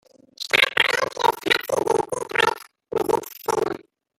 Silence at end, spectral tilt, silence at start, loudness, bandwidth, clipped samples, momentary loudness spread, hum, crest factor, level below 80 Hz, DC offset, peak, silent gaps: 0.4 s; -2 dB/octave; 0.4 s; -22 LUFS; 17 kHz; under 0.1%; 12 LU; none; 22 dB; -60 dBFS; under 0.1%; -2 dBFS; none